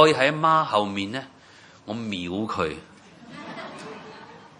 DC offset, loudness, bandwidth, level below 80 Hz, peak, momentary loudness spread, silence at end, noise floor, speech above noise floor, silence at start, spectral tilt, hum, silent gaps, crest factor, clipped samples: under 0.1%; -24 LUFS; 11 kHz; -64 dBFS; 0 dBFS; 24 LU; 0.15 s; -51 dBFS; 28 dB; 0 s; -5 dB/octave; none; none; 24 dB; under 0.1%